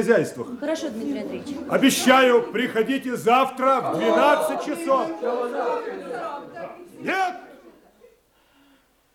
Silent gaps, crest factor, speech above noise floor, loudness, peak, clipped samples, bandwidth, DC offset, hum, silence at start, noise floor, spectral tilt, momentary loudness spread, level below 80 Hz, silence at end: none; 20 dB; 38 dB; -22 LUFS; -2 dBFS; under 0.1%; 17.5 kHz; under 0.1%; none; 0 s; -60 dBFS; -4 dB/octave; 15 LU; -68 dBFS; 1.45 s